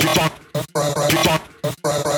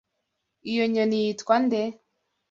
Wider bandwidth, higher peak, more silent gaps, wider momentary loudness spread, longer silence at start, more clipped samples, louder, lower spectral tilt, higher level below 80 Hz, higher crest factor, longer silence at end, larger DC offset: first, over 20 kHz vs 7.6 kHz; first, -4 dBFS vs -8 dBFS; neither; about the same, 9 LU vs 9 LU; second, 0 s vs 0.65 s; neither; first, -20 LUFS vs -25 LUFS; about the same, -4 dB/octave vs -5 dB/octave; first, -48 dBFS vs -70 dBFS; about the same, 16 dB vs 18 dB; second, 0 s vs 0.6 s; neither